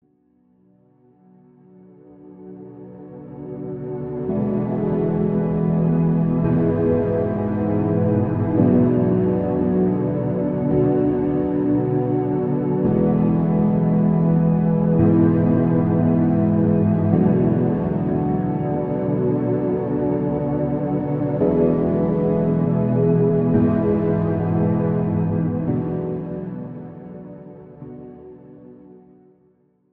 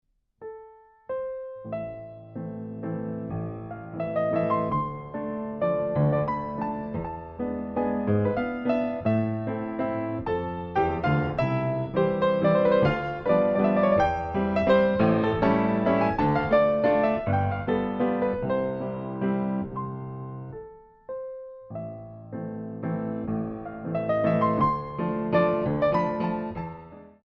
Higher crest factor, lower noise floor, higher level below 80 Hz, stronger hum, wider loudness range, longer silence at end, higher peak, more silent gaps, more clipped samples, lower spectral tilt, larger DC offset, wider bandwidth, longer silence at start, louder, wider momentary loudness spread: about the same, 16 dB vs 18 dB; first, -60 dBFS vs -51 dBFS; first, -44 dBFS vs -50 dBFS; neither; about the same, 11 LU vs 12 LU; first, 1 s vs 0.15 s; first, -4 dBFS vs -8 dBFS; neither; neither; first, -13.5 dB/octave vs -9.5 dB/octave; neither; second, 3.2 kHz vs 6 kHz; first, 2.2 s vs 0.4 s; first, -20 LUFS vs -26 LUFS; about the same, 15 LU vs 15 LU